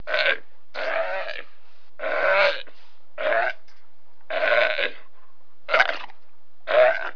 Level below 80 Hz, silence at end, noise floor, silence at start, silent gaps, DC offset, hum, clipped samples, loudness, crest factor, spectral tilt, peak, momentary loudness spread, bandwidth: -72 dBFS; 0 s; -63 dBFS; 0.05 s; none; 4%; none; under 0.1%; -23 LUFS; 24 dB; -3 dB/octave; 0 dBFS; 18 LU; 5.4 kHz